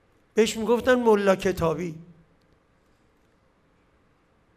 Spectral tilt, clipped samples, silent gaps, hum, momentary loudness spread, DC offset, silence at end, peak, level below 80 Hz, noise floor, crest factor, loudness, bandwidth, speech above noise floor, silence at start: -5 dB/octave; under 0.1%; none; none; 12 LU; under 0.1%; 2.55 s; -8 dBFS; -54 dBFS; -63 dBFS; 18 dB; -23 LUFS; 15.5 kHz; 41 dB; 0.35 s